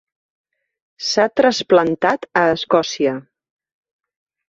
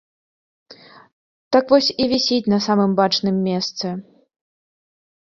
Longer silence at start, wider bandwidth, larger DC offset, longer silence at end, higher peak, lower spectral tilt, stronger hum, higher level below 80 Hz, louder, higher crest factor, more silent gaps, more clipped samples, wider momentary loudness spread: first, 1 s vs 0.7 s; about the same, 7.8 kHz vs 7.4 kHz; neither; about the same, 1.3 s vs 1.2 s; about the same, -2 dBFS vs -2 dBFS; second, -4 dB/octave vs -5.5 dB/octave; neither; about the same, -60 dBFS vs -60 dBFS; about the same, -17 LUFS vs -18 LUFS; about the same, 18 dB vs 18 dB; second, none vs 1.12-1.51 s; neither; about the same, 7 LU vs 9 LU